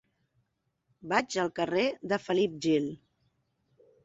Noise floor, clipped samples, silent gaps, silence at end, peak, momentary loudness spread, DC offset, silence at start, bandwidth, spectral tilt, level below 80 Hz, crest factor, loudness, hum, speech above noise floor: -78 dBFS; under 0.1%; none; 1.1 s; -10 dBFS; 9 LU; under 0.1%; 1.05 s; 8.2 kHz; -5 dB/octave; -72 dBFS; 22 dB; -30 LUFS; none; 49 dB